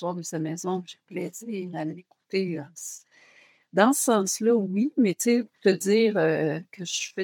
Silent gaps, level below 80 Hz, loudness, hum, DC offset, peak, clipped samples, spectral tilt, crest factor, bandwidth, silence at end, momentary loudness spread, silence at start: none; -86 dBFS; -25 LUFS; none; under 0.1%; -4 dBFS; under 0.1%; -4.5 dB/octave; 22 dB; 18 kHz; 0 s; 14 LU; 0 s